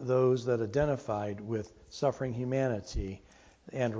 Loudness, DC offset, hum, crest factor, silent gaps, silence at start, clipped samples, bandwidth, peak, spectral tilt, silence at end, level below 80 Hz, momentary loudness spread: -32 LUFS; under 0.1%; none; 16 dB; none; 0 s; under 0.1%; 8 kHz; -14 dBFS; -7 dB/octave; 0 s; -48 dBFS; 13 LU